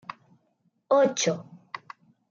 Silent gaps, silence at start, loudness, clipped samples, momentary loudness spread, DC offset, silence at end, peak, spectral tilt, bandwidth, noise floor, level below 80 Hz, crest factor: none; 0.9 s; -25 LUFS; under 0.1%; 20 LU; under 0.1%; 0.55 s; -10 dBFS; -3.5 dB/octave; 7.6 kHz; -71 dBFS; -78 dBFS; 18 dB